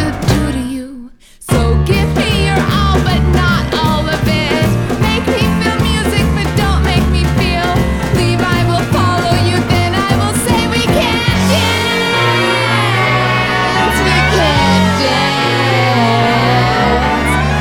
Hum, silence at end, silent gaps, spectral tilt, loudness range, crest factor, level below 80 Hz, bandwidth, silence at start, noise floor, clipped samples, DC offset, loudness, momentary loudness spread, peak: none; 0 s; none; -5 dB/octave; 2 LU; 12 dB; -22 dBFS; 18.5 kHz; 0 s; -33 dBFS; under 0.1%; under 0.1%; -12 LUFS; 3 LU; 0 dBFS